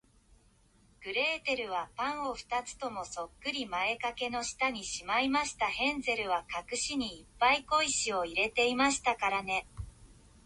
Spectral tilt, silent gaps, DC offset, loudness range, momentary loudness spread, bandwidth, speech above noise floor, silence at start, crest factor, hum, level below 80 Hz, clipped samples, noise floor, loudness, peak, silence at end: -1.5 dB/octave; none; under 0.1%; 5 LU; 10 LU; 11.5 kHz; 32 dB; 1 s; 18 dB; none; -58 dBFS; under 0.1%; -65 dBFS; -32 LUFS; -16 dBFS; 0.35 s